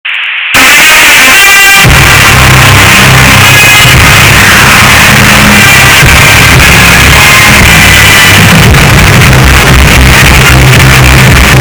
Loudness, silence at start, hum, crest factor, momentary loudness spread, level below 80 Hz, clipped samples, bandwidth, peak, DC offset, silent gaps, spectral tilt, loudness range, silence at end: 1 LUFS; 0.05 s; none; 0 dB; 3 LU; -12 dBFS; 80%; over 20 kHz; 0 dBFS; under 0.1%; none; -3 dB/octave; 1 LU; 0 s